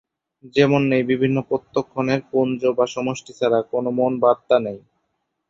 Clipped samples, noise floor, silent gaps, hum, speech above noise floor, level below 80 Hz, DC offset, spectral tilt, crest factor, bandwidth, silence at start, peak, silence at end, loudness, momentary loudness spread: under 0.1%; -74 dBFS; none; none; 54 dB; -60 dBFS; under 0.1%; -6.5 dB/octave; 20 dB; 7.6 kHz; 0.45 s; -2 dBFS; 0.7 s; -20 LUFS; 8 LU